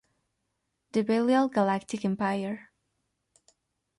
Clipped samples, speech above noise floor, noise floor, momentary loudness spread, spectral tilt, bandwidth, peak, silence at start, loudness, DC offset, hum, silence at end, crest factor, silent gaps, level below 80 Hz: under 0.1%; 53 dB; -80 dBFS; 9 LU; -6.5 dB/octave; 11.5 kHz; -12 dBFS; 0.95 s; -28 LUFS; under 0.1%; none; 1.35 s; 18 dB; none; -72 dBFS